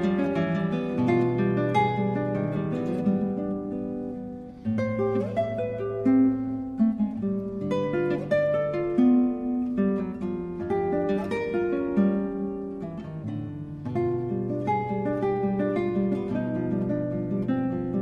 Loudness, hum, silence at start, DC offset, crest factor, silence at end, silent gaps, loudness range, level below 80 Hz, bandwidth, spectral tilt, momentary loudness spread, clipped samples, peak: -27 LUFS; none; 0 s; under 0.1%; 14 dB; 0 s; none; 3 LU; -54 dBFS; 7 kHz; -9.5 dB/octave; 9 LU; under 0.1%; -10 dBFS